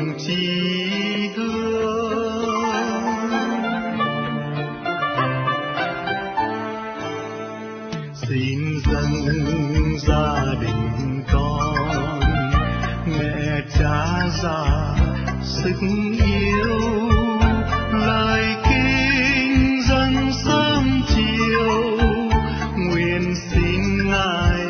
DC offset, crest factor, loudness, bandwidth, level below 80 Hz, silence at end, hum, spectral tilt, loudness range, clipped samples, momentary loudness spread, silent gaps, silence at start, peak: under 0.1%; 18 dB; -20 LUFS; 6.6 kHz; -28 dBFS; 0 s; none; -6 dB/octave; 6 LU; under 0.1%; 7 LU; none; 0 s; -2 dBFS